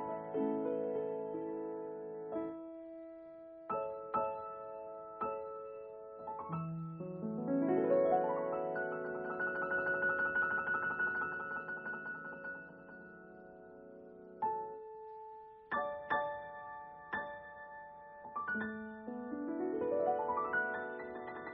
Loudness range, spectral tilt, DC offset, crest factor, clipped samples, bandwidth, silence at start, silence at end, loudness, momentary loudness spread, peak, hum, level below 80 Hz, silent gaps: 9 LU; -5.5 dB/octave; under 0.1%; 20 dB; under 0.1%; 4.6 kHz; 0 s; 0 s; -38 LUFS; 18 LU; -20 dBFS; none; -74 dBFS; none